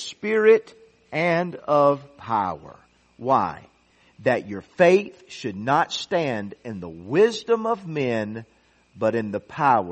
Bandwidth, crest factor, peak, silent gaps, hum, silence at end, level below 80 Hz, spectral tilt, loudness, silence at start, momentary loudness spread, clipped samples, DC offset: 8.4 kHz; 20 dB; -4 dBFS; none; none; 0 s; -64 dBFS; -5.5 dB/octave; -22 LUFS; 0 s; 16 LU; under 0.1%; under 0.1%